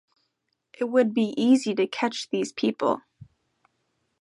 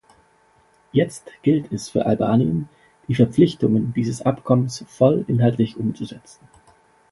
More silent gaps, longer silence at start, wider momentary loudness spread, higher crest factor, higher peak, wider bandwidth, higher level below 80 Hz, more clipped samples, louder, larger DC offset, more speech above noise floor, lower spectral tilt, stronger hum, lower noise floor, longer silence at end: neither; second, 0.8 s vs 0.95 s; about the same, 8 LU vs 10 LU; about the same, 18 dB vs 20 dB; second, -8 dBFS vs -2 dBFS; about the same, 11.5 kHz vs 11.5 kHz; second, -74 dBFS vs -54 dBFS; neither; second, -25 LUFS vs -20 LUFS; neither; first, 54 dB vs 38 dB; second, -5 dB/octave vs -7.5 dB/octave; neither; first, -77 dBFS vs -58 dBFS; about the same, 0.95 s vs 0.95 s